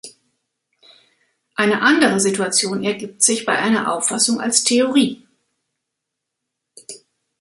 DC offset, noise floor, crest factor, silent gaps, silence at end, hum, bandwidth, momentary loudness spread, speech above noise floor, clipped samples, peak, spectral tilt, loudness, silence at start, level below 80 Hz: under 0.1%; -80 dBFS; 20 dB; none; 0.45 s; none; 12 kHz; 14 LU; 63 dB; under 0.1%; 0 dBFS; -2.5 dB/octave; -17 LUFS; 0.05 s; -66 dBFS